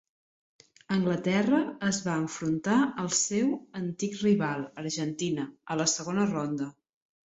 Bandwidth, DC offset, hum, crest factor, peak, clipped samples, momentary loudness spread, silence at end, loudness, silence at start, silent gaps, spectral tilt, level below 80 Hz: 8.2 kHz; under 0.1%; none; 18 dB; -12 dBFS; under 0.1%; 8 LU; 0.6 s; -29 LUFS; 0.9 s; none; -4.5 dB/octave; -66 dBFS